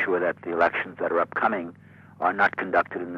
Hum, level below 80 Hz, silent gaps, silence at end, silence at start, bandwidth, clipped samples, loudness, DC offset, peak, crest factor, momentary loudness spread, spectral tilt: none; -66 dBFS; none; 0 s; 0 s; 7.4 kHz; under 0.1%; -25 LUFS; under 0.1%; -8 dBFS; 16 dB; 6 LU; -7 dB/octave